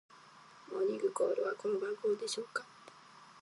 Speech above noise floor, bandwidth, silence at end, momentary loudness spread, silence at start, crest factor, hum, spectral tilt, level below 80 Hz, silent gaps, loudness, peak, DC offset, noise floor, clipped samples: 23 dB; 11.5 kHz; 0 s; 23 LU; 0.1 s; 16 dB; none; -3 dB/octave; under -90 dBFS; none; -36 LUFS; -22 dBFS; under 0.1%; -58 dBFS; under 0.1%